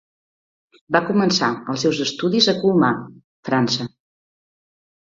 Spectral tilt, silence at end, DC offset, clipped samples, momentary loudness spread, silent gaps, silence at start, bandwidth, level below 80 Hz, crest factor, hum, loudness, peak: -4.5 dB/octave; 1.15 s; under 0.1%; under 0.1%; 8 LU; 3.24-3.43 s; 0.9 s; 7.8 kHz; -62 dBFS; 20 dB; none; -19 LUFS; -2 dBFS